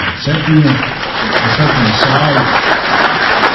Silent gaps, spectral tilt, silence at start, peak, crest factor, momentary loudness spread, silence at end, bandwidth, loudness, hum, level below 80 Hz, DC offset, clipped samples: none; -6 dB/octave; 0 s; 0 dBFS; 12 dB; 5 LU; 0 s; 6 kHz; -11 LUFS; none; -36 dBFS; under 0.1%; 0.2%